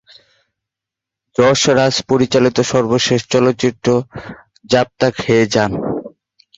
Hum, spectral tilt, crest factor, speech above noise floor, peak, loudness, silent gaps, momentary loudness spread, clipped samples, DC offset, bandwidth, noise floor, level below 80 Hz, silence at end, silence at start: none; -4.5 dB/octave; 14 dB; 70 dB; -2 dBFS; -15 LUFS; none; 11 LU; under 0.1%; under 0.1%; 8 kHz; -84 dBFS; -48 dBFS; 0.5 s; 1.4 s